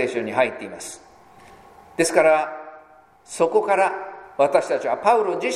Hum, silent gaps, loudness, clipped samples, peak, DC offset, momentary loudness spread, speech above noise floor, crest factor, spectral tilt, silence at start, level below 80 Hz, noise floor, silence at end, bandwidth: none; none; -20 LUFS; under 0.1%; -2 dBFS; under 0.1%; 18 LU; 29 dB; 20 dB; -3.5 dB/octave; 0 s; -66 dBFS; -50 dBFS; 0 s; 15 kHz